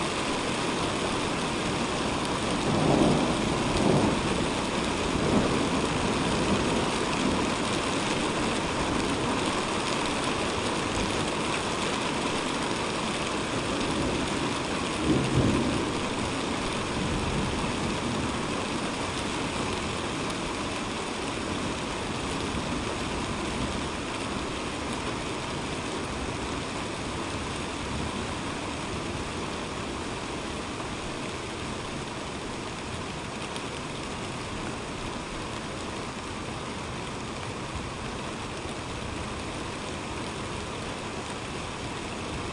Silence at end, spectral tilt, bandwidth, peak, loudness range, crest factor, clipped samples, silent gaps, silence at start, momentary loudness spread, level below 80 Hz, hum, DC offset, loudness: 0 s; -4.5 dB/octave; 11.5 kHz; -10 dBFS; 8 LU; 20 dB; under 0.1%; none; 0 s; 9 LU; -44 dBFS; none; under 0.1%; -29 LUFS